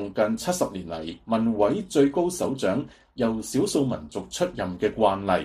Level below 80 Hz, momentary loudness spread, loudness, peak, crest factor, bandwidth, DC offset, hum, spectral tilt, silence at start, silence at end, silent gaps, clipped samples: -52 dBFS; 11 LU; -25 LUFS; -8 dBFS; 18 dB; 15 kHz; under 0.1%; none; -5 dB/octave; 0 s; 0 s; none; under 0.1%